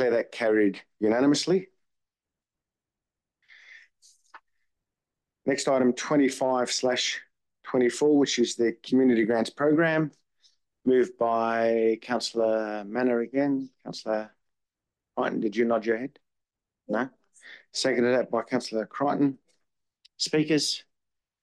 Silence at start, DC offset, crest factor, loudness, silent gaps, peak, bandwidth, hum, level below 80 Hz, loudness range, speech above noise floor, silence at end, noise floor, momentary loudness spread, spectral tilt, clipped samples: 0 s; under 0.1%; 14 dB; -26 LUFS; none; -12 dBFS; 12 kHz; none; -76 dBFS; 6 LU; over 65 dB; 0.6 s; under -90 dBFS; 9 LU; -4.5 dB/octave; under 0.1%